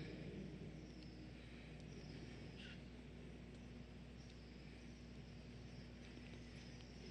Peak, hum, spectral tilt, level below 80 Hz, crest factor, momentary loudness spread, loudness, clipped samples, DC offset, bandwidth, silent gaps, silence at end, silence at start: -42 dBFS; none; -6 dB/octave; -62 dBFS; 14 dB; 5 LU; -56 LUFS; under 0.1%; under 0.1%; 9 kHz; none; 0 s; 0 s